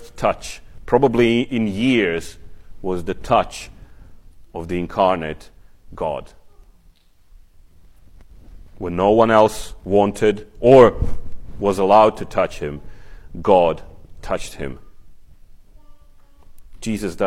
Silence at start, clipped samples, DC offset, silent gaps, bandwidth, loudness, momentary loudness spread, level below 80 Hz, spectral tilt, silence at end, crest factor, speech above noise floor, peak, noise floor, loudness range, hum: 0 s; under 0.1%; under 0.1%; none; 15 kHz; -18 LUFS; 21 LU; -38 dBFS; -6 dB/octave; 0 s; 20 dB; 34 dB; 0 dBFS; -51 dBFS; 15 LU; none